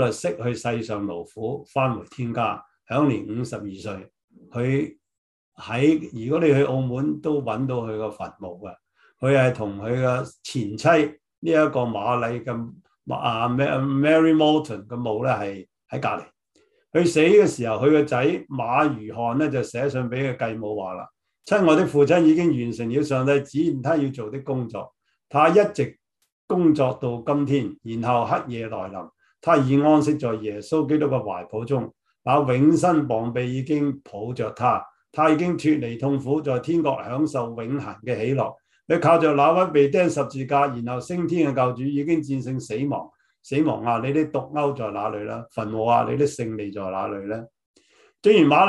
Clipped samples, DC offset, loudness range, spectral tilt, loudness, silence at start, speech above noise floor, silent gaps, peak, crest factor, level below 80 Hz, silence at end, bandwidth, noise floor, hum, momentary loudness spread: under 0.1%; under 0.1%; 5 LU; -7 dB/octave; -22 LUFS; 0 s; 42 dB; 4.24-4.28 s, 5.18-5.52 s, 11.38-11.42 s, 26.32-26.48 s, 47.66-47.74 s; -4 dBFS; 18 dB; -62 dBFS; 0 s; 11.5 kHz; -64 dBFS; none; 14 LU